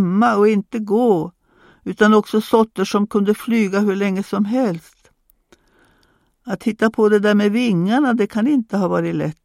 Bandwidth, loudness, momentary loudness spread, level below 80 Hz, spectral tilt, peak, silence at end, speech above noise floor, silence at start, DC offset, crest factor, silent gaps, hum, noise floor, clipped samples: 15 kHz; -17 LUFS; 8 LU; -60 dBFS; -6.5 dB/octave; 0 dBFS; 0.15 s; 43 dB; 0 s; under 0.1%; 18 dB; none; none; -60 dBFS; under 0.1%